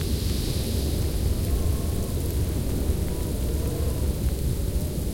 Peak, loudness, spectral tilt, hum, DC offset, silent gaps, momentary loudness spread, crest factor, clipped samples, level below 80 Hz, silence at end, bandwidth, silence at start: -14 dBFS; -27 LUFS; -6 dB/octave; none; under 0.1%; none; 2 LU; 12 dB; under 0.1%; -28 dBFS; 0 s; 17 kHz; 0 s